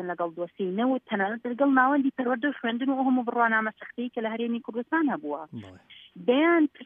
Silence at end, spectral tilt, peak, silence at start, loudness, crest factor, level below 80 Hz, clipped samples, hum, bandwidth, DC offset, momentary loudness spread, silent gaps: 0 s; -8.5 dB/octave; -8 dBFS; 0 s; -26 LUFS; 18 dB; -80 dBFS; under 0.1%; none; 3.7 kHz; under 0.1%; 12 LU; none